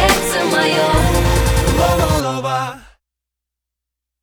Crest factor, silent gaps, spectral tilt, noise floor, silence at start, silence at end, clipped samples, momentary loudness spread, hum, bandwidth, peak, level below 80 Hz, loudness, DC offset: 16 dB; none; -4.5 dB/octave; -83 dBFS; 0 s; 1.45 s; under 0.1%; 6 LU; none; over 20 kHz; 0 dBFS; -24 dBFS; -15 LUFS; under 0.1%